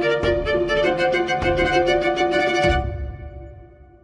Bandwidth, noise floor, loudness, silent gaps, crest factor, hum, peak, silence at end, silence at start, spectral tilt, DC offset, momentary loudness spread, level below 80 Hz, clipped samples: 11 kHz; -44 dBFS; -20 LUFS; none; 14 dB; none; -6 dBFS; 0.2 s; 0 s; -5.5 dB/octave; under 0.1%; 15 LU; -34 dBFS; under 0.1%